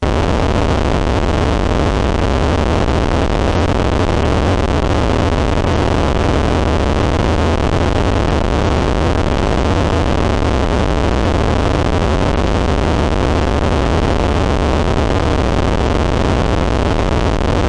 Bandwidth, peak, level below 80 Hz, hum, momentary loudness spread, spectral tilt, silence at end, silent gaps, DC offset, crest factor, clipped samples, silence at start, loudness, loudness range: 11 kHz; -2 dBFS; -20 dBFS; none; 1 LU; -6.5 dB/octave; 0 s; none; under 0.1%; 12 dB; under 0.1%; 0 s; -15 LUFS; 0 LU